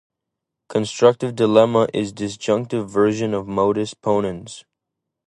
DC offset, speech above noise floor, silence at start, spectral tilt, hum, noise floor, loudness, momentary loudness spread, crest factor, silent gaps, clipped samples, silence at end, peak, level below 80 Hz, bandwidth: under 0.1%; 63 dB; 0.7 s; -6 dB/octave; none; -82 dBFS; -20 LUFS; 11 LU; 20 dB; none; under 0.1%; 0.7 s; 0 dBFS; -56 dBFS; 11.5 kHz